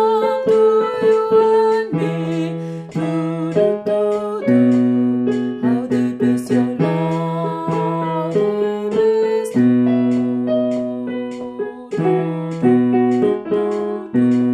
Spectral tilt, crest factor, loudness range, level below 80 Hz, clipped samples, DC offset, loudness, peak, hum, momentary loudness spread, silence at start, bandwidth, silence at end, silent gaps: -8 dB/octave; 14 dB; 2 LU; -60 dBFS; under 0.1%; under 0.1%; -18 LUFS; -4 dBFS; none; 9 LU; 0 s; 10.5 kHz; 0 s; none